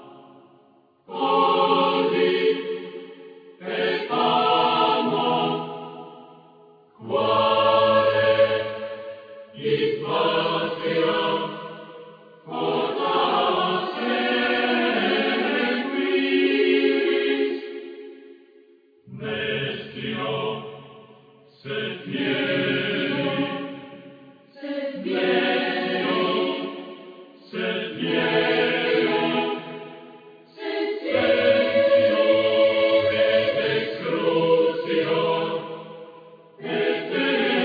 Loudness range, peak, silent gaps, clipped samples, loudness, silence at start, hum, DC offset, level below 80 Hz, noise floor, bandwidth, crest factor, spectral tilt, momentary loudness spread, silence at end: 6 LU; -6 dBFS; none; under 0.1%; -22 LUFS; 0 s; none; under 0.1%; -66 dBFS; -58 dBFS; 5 kHz; 16 dB; -7.5 dB/octave; 18 LU; 0 s